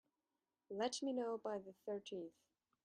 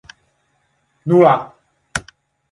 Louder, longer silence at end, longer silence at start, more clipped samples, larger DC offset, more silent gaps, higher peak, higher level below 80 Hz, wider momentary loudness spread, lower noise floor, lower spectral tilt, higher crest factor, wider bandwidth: second, -45 LUFS vs -16 LUFS; about the same, 0.55 s vs 0.5 s; second, 0.7 s vs 1.05 s; neither; neither; neither; second, -28 dBFS vs 0 dBFS; second, -90 dBFS vs -52 dBFS; second, 10 LU vs 18 LU; first, under -90 dBFS vs -64 dBFS; second, -3.5 dB/octave vs -6.5 dB/octave; about the same, 18 dB vs 18 dB; about the same, 10.5 kHz vs 11.5 kHz